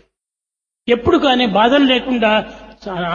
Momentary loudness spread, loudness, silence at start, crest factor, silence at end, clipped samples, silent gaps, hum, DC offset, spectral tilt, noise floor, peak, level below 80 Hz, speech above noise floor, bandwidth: 17 LU; -14 LUFS; 0.9 s; 16 dB; 0 s; under 0.1%; none; none; under 0.1%; -5.5 dB/octave; -86 dBFS; 0 dBFS; -44 dBFS; 72 dB; 7.2 kHz